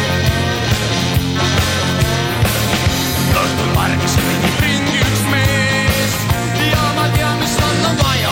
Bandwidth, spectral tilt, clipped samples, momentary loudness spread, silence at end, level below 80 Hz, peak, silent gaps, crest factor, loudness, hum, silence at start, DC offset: 17 kHz; -4.5 dB/octave; under 0.1%; 2 LU; 0 s; -28 dBFS; -2 dBFS; none; 12 dB; -15 LUFS; none; 0 s; under 0.1%